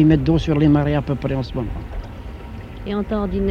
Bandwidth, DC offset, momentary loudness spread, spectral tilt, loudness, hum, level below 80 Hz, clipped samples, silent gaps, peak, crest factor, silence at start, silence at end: 7 kHz; under 0.1%; 19 LU; -9 dB/octave; -20 LUFS; none; -32 dBFS; under 0.1%; none; -2 dBFS; 18 dB; 0 s; 0 s